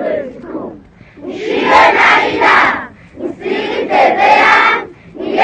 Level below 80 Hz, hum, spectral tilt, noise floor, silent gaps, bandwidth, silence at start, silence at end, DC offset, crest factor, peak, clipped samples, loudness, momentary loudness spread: -48 dBFS; none; -3.5 dB/octave; -37 dBFS; none; 9.4 kHz; 0 s; 0 s; under 0.1%; 12 dB; 0 dBFS; 0.2%; -10 LUFS; 19 LU